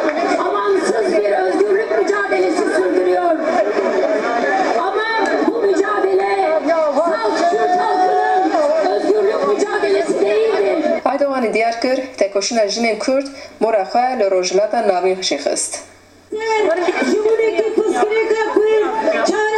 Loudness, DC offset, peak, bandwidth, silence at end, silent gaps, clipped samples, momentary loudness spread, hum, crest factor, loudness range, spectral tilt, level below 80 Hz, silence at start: -16 LUFS; under 0.1%; 0 dBFS; 11.5 kHz; 0 s; none; under 0.1%; 3 LU; none; 16 dB; 2 LU; -3 dB/octave; -60 dBFS; 0 s